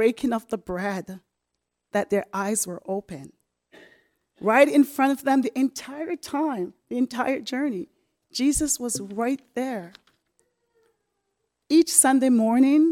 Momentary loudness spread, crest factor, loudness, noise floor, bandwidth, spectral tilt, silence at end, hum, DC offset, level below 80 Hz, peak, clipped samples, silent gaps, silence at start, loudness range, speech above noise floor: 15 LU; 22 dB; -23 LUFS; -81 dBFS; 18 kHz; -3.5 dB/octave; 0 s; none; under 0.1%; -54 dBFS; -4 dBFS; under 0.1%; none; 0 s; 7 LU; 58 dB